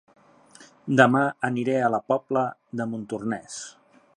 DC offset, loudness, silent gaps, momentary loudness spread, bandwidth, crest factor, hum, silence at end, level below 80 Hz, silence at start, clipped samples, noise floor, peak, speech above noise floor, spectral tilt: under 0.1%; -24 LUFS; none; 18 LU; 10.5 kHz; 24 dB; none; 0.45 s; -70 dBFS; 0.6 s; under 0.1%; -52 dBFS; -2 dBFS; 28 dB; -6 dB/octave